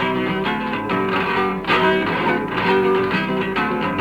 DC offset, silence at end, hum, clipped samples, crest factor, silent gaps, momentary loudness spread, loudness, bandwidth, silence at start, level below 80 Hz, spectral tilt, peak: under 0.1%; 0 s; none; under 0.1%; 14 dB; none; 5 LU; -19 LUFS; 17 kHz; 0 s; -46 dBFS; -6.5 dB/octave; -6 dBFS